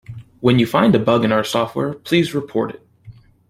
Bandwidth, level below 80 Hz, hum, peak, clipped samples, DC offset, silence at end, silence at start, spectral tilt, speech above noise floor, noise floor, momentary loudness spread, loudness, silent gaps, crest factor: 16 kHz; -54 dBFS; none; -2 dBFS; under 0.1%; under 0.1%; 0.4 s; 0.1 s; -6.5 dB/octave; 27 dB; -44 dBFS; 9 LU; -18 LUFS; none; 16 dB